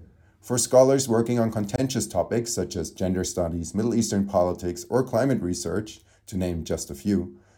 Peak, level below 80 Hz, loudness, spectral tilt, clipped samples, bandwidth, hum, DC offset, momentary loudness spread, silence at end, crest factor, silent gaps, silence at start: -4 dBFS; -48 dBFS; -25 LUFS; -5.5 dB/octave; under 0.1%; 17.5 kHz; none; under 0.1%; 10 LU; 0.2 s; 20 dB; none; 0 s